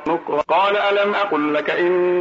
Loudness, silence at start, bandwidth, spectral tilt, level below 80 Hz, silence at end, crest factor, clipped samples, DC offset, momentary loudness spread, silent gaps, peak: -18 LUFS; 0 s; 7.4 kHz; -6 dB/octave; -62 dBFS; 0 s; 10 dB; under 0.1%; under 0.1%; 3 LU; none; -8 dBFS